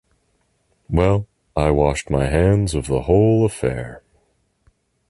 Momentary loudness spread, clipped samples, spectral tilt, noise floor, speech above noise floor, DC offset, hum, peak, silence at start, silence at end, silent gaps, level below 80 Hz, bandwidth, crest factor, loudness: 8 LU; under 0.1%; -7 dB/octave; -65 dBFS; 48 dB; under 0.1%; none; -2 dBFS; 0.9 s; 1.1 s; none; -32 dBFS; 11.5 kHz; 16 dB; -19 LUFS